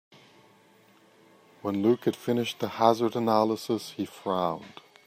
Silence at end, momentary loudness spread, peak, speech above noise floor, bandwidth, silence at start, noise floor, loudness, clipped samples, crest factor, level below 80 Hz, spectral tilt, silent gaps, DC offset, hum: 0.4 s; 12 LU; -6 dBFS; 32 dB; 15.5 kHz; 1.65 s; -59 dBFS; -27 LUFS; under 0.1%; 24 dB; -74 dBFS; -6 dB/octave; none; under 0.1%; none